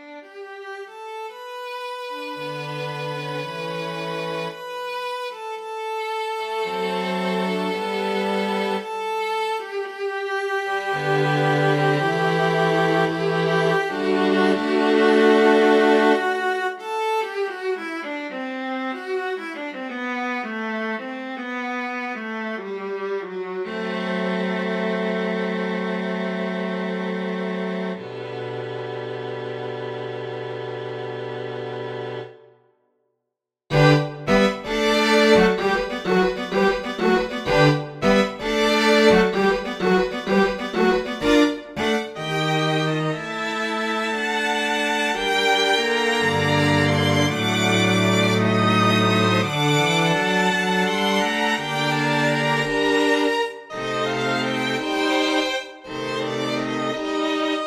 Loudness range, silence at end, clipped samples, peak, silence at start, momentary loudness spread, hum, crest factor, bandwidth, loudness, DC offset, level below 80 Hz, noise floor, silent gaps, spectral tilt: 10 LU; 0 s; under 0.1%; -2 dBFS; 0 s; 13 LU; none; 20 dB; 15 kHz; -22 LUFS; under 0.1%; -52 dBFS; -82 dBFS; none; -5 dB/octave